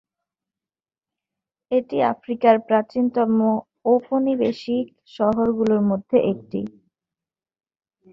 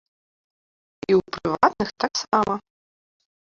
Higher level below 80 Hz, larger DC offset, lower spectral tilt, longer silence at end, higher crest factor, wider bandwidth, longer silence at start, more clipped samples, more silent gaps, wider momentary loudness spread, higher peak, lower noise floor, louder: second, -62 dBFS vs -56 dBFS; neither; first, -8.5 dB/octave vs -4.5 dB/octave; first, 1.45 s vs 0.95 s; about the same, 20 dB vs 24 dB; about the same, 7 kHz vs 7.6 kHz; first, 1.7 s vs 1.1 s; neither; neither; about the same, 8 LU vs 8 LU; about the same, -2 dBFS vs -2 dBFS; about the same, under -90 dBFS vs under -90 dBFS; about the same, -21 LUFS vs -23 LUFS